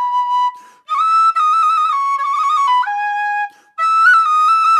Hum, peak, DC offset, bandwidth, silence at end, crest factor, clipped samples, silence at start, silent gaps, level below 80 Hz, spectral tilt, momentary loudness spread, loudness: none; -2 dBFS; under 0.1%; 12 kHz; 0 s; 12 dB; under 0.1%; 0 s; none; under -90 dBFS; 4 dB/octave; 10 LU; -14 LUFS